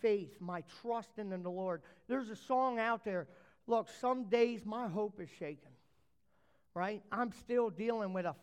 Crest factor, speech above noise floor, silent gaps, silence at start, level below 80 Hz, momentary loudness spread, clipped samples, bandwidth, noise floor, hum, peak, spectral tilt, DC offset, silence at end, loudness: 18 dB; 40 dB; none; 0 s; -78 dBFS; 12 LU; under 0.1%; 11.5 kHz; -77 dBFS; none; -20 dBFS; -6.5 dB/octave; under 0.1%; 0.05 s; -38 LUFS